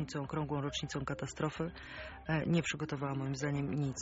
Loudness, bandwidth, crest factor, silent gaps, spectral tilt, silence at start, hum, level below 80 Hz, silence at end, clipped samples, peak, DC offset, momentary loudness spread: -37 LUFS; 8 kHz; 16 dB; none; -5.5 dB/octave; 0 s; none; -58 dBFS; 0 s; under 0.1%; -20 dBFS; under 0.1%; 8 LU